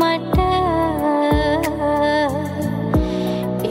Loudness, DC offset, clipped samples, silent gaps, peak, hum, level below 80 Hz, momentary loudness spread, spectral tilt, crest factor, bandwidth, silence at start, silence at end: -19 LUFS; under 0.1%; under 0.1%; none; -4 dBFS; none; -30 dBFS; 5 LU; -6.5 dB/octave; 14 dB; 16.5 kHz; 0 s; 0 s